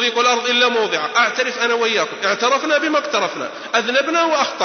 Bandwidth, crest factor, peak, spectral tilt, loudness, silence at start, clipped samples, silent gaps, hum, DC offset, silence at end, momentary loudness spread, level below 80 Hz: 6.6 kHz; 16 dB; -2 dBFS; -1.5 dB/octave; -17 LUFS; 0 s; under 0.1%; none; none; under 0.1%; 0 s; 5 LU; -72 dBFS